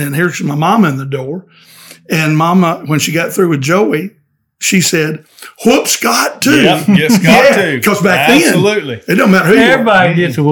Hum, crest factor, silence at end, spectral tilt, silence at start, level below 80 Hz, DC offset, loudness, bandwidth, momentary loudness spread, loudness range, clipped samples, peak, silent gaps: none; 10 dB; 0 s; -4.5 dB/octave; 0 s; -50 dBFS; under 0.1%; -10 LUFS; 19.5 kHz; 10 LU; 5 LU; 1%; 0 dBFS; none